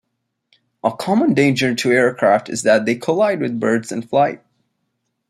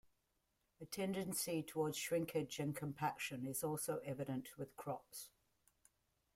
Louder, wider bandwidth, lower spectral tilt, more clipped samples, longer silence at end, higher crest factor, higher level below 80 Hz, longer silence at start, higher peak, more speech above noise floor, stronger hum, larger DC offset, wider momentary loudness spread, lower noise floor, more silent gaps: first, -17 LUFS vs -43 LUFS; second, 14.5 kHz vs 16.5 kHz; about the same, -5 dB/octave vs -4.5 dB/octave; neither; second, 0.95 s vs 1.1 s; about the same, 16 dB vs 18 dB; first, -62 dBFS vs -78 dBFS; about the same, 0.85 s vs 0.8 s; first, -2 dBFS vs -28 dBFS; first, 58 dB vs 41 dB; neither; neither; second, 7 LU vs 10 LU; second, -74 dBFS vs -84 dBFS; neither